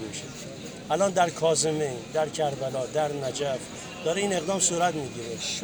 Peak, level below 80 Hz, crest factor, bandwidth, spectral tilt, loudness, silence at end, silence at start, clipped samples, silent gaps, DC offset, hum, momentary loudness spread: -10 dBFS; -60 dBFS; 18 dB; over 20 kHz; -3.5 dB/octave; -27 LUFS; 0 s; 0 s; under 0.1%; none; under 0.1%; none; 13 LU